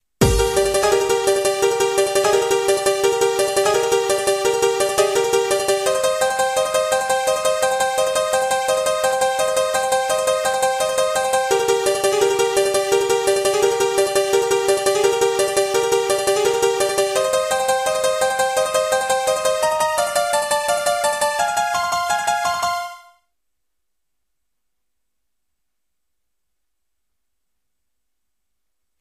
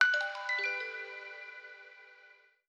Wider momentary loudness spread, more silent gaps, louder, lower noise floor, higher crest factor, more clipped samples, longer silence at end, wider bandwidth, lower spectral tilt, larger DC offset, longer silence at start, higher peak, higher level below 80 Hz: second, 2 LU vs 21 LU; neither; first, -18 LUFS vs -34 LUFS; first, -81 dBFS vs -62 dBFS; second, 16 dB vs 26 dB; neither; first, 6 s vs 0.4 s; first, 15.5 kHz vs 9.4 kHz; first, -2.5 dB/octave vs 2 dB/octave; neither; first, 0.2 s vs 0 s; first, -2 dBFS vs -10 dBFS; first, -42 dBFS vs under -90 dBFS